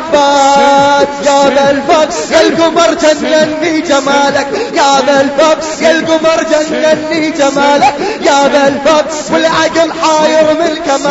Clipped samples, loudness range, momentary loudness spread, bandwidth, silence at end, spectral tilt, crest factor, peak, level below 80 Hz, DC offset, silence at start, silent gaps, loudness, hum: 0.3%; 1 LU; 4 LU; 8.2 kHz; 0 s; -3 dB/octave; 8 dB; 0 dBFS; -44 dBFS; under 0.1%; 0 s; none; -9 LUFS; none